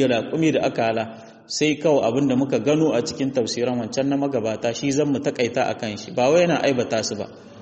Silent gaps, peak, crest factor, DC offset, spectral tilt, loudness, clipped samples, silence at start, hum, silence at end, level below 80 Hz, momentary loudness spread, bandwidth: none; -6 dBFS; 16 dB; under 0.1%; -5 dB/octave; -21 LUFS; under 0.1%; 0 s; none; 0 s; -60 dBFS; 8 LU; 8.4 kHz